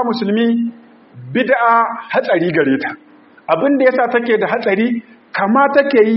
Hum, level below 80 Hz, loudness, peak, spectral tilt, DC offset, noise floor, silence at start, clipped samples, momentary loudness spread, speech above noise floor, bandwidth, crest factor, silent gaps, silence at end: none; -64 dBFS; -15 LUFS; 0 dBFS; -4 dB/octave; under 0.1%; -36 dBFS; 0 s; under 0.1%; 12 LU; 23 dB; 5.8 kHz; 14 dB; none; 0 s